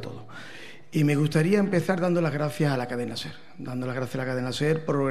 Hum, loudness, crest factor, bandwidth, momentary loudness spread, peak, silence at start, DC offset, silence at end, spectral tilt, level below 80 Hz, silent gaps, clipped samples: none; -26 LUFS; 18 dB; 14 kHz; 18 LU; -8 dBFS; 0 s; 0.7%; 0 s; -6.5 dB/octave; -66 dBFS; none; under 0.1%